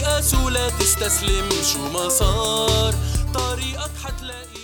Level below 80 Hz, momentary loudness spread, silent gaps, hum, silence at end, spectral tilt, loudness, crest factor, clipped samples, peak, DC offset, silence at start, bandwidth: -26 dBFS; 11 LU; none; none; 0 s; -3 dB/octave; -20 LUFS; 16 dB; under 0.1%; -6 dBFS; under 0.1%; 0 s; over 20 kHz